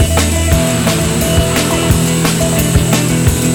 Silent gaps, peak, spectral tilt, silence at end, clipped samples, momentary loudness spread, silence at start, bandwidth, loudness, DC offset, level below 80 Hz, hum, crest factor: none; 0 dBFS; -4.5 dB/octave; 0 s; under 0.1%; 1 LU; 0 s; over 20 kHz; -12 LUFS; under 0.1%; -22 dBFS; none; 12 dB